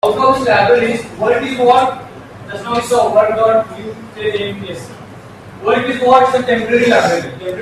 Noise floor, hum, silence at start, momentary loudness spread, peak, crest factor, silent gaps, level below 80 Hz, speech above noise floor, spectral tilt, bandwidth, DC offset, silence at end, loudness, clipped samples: -34 dBFS; none; 0.05 s; 18 LU; 0 dBFS; 14 dB; none; -48 dBFS; 21 dB; -5 dB/octave; 13.5 kHz; under 0.1%; 0 s; -13 LUFS; under 0.1%